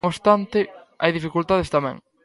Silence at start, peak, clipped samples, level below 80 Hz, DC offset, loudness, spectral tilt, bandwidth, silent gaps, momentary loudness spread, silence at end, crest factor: 0.05 s; -2 dBFS; under 0.1%; -48 dBFS; under 0.1%; -22 LUFS; -6.5 dB/octave; 11.5 kHz; none; 7 LU; 0.25 s; 20 dB